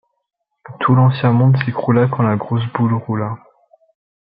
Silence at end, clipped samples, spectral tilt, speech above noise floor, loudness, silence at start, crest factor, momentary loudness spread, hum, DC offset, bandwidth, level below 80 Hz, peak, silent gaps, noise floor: 0.9 s; under 0.1%; -12.5 dB/octave; 59 dB; -16 LUFS; 0.7 s; 16 dB; 9 LU; none; under 0.1%; 5 kHz; -58 dBFS; 0 dBFS; none; -74 dBFS